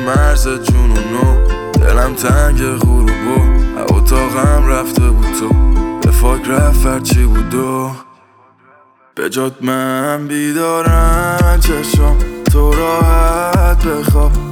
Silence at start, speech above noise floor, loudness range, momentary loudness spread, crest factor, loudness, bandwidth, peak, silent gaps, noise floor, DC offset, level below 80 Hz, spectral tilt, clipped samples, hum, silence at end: 0 s; 36 dB; 5 LU; 5 LU; 10 dB; -13 LUFS; 17.5 kHz; 0 dBFS; none; -47 dBFS; under 0.1%; -12 dBFS; -6 dB/octave; under 0.1%; none; 0 s